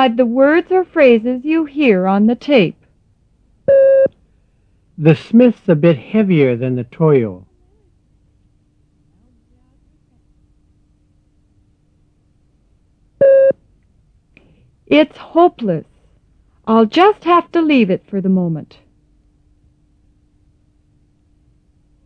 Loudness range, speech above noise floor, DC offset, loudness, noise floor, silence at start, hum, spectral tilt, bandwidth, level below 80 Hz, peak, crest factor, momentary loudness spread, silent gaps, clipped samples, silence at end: 8 LU; 43 dB; under 0.1%; -13 LUFS; -56 dBFS; 0 s; none; -9 dB/octave; 6.2 kHz; -56 dBFS; 0 dBFS; 16 dB; 9 LU; none; under 0.1%; 3.4 s